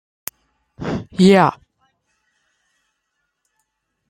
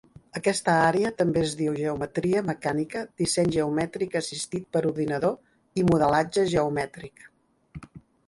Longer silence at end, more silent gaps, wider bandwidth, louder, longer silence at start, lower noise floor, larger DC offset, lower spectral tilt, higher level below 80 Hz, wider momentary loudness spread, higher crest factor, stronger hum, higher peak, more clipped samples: first, 2.55 s vs 0.3 s; neither; first, 16 kHz vs 11.5 kHz; first, -16 LUFS vs -26 LUFS; first, 0.8 s vs 0.35 s; first, -74 dBFS vs -46 dBFS; neither; first, -6.5 dB/octave vs -5 dB/octave; about the same, -52 dBFS vs -54 dBFS; first, 21 LU vs 13 LU; about the same, 20 dB vs 18 dB; neither; first, -2 dBFS vs -8 dBFS; neither